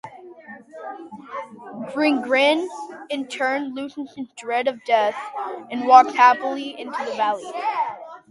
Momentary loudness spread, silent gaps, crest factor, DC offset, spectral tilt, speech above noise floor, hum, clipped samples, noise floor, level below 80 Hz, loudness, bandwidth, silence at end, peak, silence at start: 21 LU; none; 22 dB; under 0.1%; -3.5 dB/octave; 21 dB; none; under 0.1%; -42 dBFS; -76 dBFS; -21 LUFS; 11.5 kHz; 0.1 s; 0 dBFS; 0.05 s